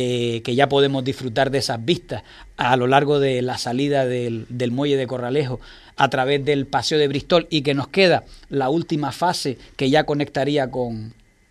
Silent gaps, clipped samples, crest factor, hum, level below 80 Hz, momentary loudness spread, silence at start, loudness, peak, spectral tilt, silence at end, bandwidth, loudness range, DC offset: none; under 0.1%; 20 dB; none; -50 dBFS; 10 LU; 0 s; -20 LUFS; -2 dBFS; -5.5 dB/octave; 0.4 s; 14 kHz; 2 LU; under 0.1%